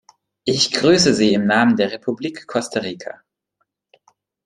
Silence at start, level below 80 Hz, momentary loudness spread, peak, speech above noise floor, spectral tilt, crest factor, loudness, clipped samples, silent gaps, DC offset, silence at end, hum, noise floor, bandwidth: 0.45 s; -56 dBFS; 14 LU; -2 dBFS; 55 dB; -4 dB/octave; 18 dB; -17 LUFS; under 0.1%; none; under 0.1%; 1.35 s; none; -72 dBFS; 11.5 kHz